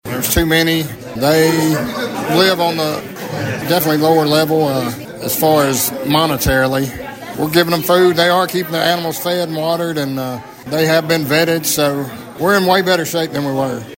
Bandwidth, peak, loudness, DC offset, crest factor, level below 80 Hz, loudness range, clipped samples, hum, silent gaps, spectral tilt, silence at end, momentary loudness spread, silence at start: 16.5 kHz; 0 dBFS; -15 LUFS; under 0.1%; 14 dB; -38 dBFS; 2 LU; under 0.1%; none; none; -4 dB/octave; 0.05 s; 10 LU; 0.05 s